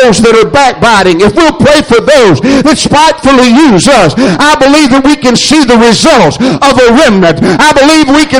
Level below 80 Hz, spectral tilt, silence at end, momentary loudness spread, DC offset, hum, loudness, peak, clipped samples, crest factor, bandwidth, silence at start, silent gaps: -28 dBFS; -4 dB/octave; 0 s; 3 LU; under 0.1%; none; -4 LUFS; 0 dBFS; 5%; 4 dB; 18 kHz; 0 s; none